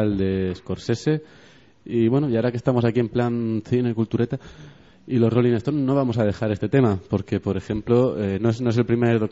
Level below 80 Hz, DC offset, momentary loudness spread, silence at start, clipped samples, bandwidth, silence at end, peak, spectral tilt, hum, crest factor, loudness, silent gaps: -50 dBFS; 0.1%; 7 LU; 0 s; under 0.1%; 7.8 kHz; 0 s; -6 dBFS; -8 dB/octave; none; 16 dB; -22 LUFS; none